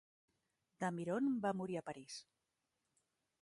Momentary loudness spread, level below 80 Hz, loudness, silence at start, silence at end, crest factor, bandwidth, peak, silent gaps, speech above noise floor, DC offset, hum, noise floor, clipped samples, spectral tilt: 14 LU; -84 dBFS; -41 LUFS; 0.8 s; 1.2 s; 18 dB; 11.5 kHz; -26 dBFS; none; 47 dB; under 0.1%; none; -88 dBFS; under 0.1%; -6 dB/octave